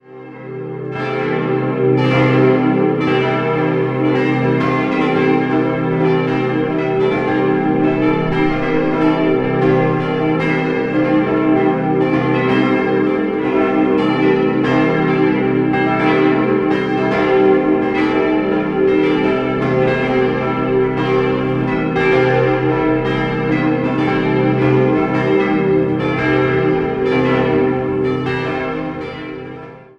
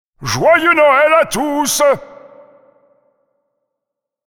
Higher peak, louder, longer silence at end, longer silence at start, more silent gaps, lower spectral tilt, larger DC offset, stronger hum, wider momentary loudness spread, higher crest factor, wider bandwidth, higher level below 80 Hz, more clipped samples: about the same, 0 dBFS vs 0 dBFS; second, -15 LUFS vs -12 LUFS; second, 0.15 s vs 2.25 s; about the same, 0.1 s vs 0.2 s; neither; first, -8.5 dB/octave vs -3 dB/octave; neither; neither; second, 4 LU vs 7 LU; about the same, 14 dB vs 16 dB; second, 6.8 kHz vs over 20 kHz; first, -42 dBFS vs -50 dBFS; neither